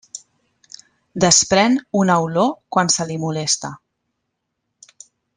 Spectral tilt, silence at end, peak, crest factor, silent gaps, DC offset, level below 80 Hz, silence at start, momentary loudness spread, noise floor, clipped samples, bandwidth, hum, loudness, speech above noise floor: -3 dB/octave; 1.6 s; 0 dBFS; 20 dB; none; under 0.1%; -56 dBFS; 0.15 s; 20 LU; -76 dBFS; under 0.1%; 11 kHz; none; -17 LUFS; 58 dB